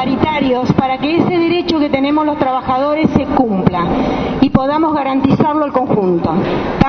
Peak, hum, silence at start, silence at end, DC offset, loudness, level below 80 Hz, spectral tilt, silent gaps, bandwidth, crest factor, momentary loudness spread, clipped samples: 0 dBFS; none; 0 s; 0 s; under 0.1%; -14 LUFS; -34 dBFS; -8 dB/octave; none; 6.4 kHz; 14 dB; 2 LU; under 0.1%